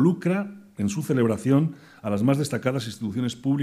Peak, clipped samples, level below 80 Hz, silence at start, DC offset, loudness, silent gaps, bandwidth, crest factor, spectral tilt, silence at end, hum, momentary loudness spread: -8 dBFS; under 0.1%; -64 dBFS; 0 s; under 0.1%; -25 LUFS; none; 15 kHz; 16 dB; -7 dB/octave; 0 s; none; 8 LU